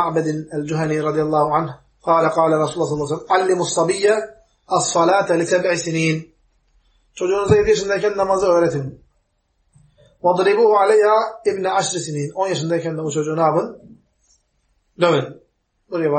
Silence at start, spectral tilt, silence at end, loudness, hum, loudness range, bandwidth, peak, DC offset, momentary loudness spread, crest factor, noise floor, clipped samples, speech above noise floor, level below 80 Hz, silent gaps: 0 s; -5 dB/octave; 0 s; -18 LUFS; none; 4 LU; 8.8 kHz; -2 dBFS; under 0.1%; 9 LU; 18 dB; -66 dBFS; under 0.1%; 48 dB; -50 dBFS; none